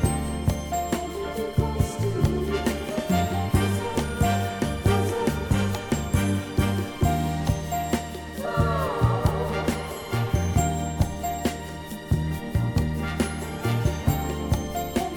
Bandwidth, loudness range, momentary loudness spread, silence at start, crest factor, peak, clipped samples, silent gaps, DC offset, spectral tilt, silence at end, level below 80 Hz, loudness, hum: 19 kHz; 2 LU; 5 LU; 0 s; 18 dB; -8 dBFS; under 0.1%; none; under 0.1%; -6 dB/octave; 0 s; -34 dBFS; -26 LUFS; none